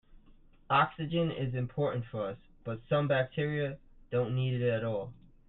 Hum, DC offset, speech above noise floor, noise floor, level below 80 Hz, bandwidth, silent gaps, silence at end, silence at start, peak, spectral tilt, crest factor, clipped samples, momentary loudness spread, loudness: none; under 0.1%; 27 dB; -58 dBFS; -58 dBFS; 4.1 kHz; none; 0.35 s; 0.7 s; -12 dBFS; -10.5 dB/octave; 20 dB; under 0.1%; 12 LU; -32 LUFS